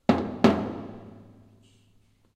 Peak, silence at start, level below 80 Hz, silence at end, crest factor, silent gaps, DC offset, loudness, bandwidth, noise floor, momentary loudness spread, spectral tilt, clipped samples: -4 dBFS; 0.1 s; -56 dBFS; 1.2 s; 24 dB; none; under 0.1%; -25 LUFS; 9.8 kHz; -62 dBFS; 23 LU; -7 dB/octave; under 0.1%